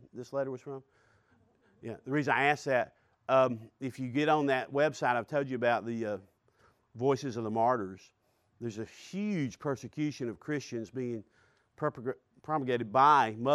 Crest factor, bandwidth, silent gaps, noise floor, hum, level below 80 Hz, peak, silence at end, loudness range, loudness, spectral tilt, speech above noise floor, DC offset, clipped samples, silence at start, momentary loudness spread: 20 dB; 13 kHz; none; -68 dBFS; none; -76 dBFS; -12 dBFS; 0 s; 7 LU; -31 LUFS; -6 dB/octave; 37 dB; under 0.1%; under 0.1%; 0.15 s; 16 LU